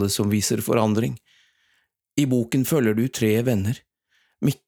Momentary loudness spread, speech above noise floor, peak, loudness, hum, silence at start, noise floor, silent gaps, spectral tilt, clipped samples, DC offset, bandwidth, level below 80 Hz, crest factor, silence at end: 9 LU; 47 dB; -4 dBFS; -22 LUFS; none; 0 s; -69 dBFS; none; -5.5 dB/octave; under 0.1%; under 0.1%; over 20 kHz; -62 dBFS; 18 dB; 0.15 s